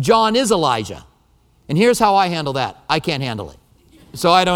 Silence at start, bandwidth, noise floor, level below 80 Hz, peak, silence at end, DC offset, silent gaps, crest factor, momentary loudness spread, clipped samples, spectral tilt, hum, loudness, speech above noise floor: 0 s; 18 kHz; -56 dBFS; -48 dBFS; 0 dBFS; 0 s; under 0.1%; none; 18 dB; 17 LU; under 0.1%; -4.5 dB/octave; none; -17 LUFS; 39 dB